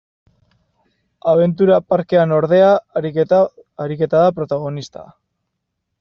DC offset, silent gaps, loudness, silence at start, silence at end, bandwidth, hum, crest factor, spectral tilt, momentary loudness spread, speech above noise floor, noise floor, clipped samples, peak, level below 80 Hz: under 0.1%; none; -16 LUFS; 1.25 s; 0.95 s; 7 kHz; none; 14 dB; -6.5 dB/octave; 14 LU; 60 dB; -75 dBFS; under 0.1%; -2 dBFS; -58 dBFS